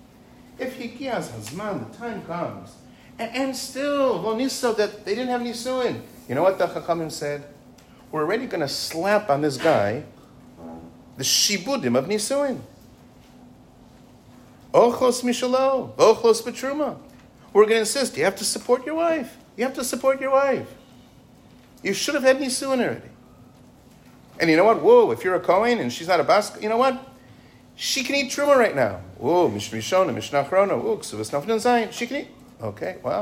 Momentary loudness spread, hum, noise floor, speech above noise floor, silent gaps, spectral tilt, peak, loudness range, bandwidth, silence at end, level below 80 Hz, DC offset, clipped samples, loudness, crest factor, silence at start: 14 LU; none; -50 dBFS; 28 dB; none; -3.5 dB/octave; -4 dBFS; 6 LU; 16 kHz; 0 s; -60 dBFS; under 0.1%; under 0.1%; -22 LUFS; 20 dB; 0.6 s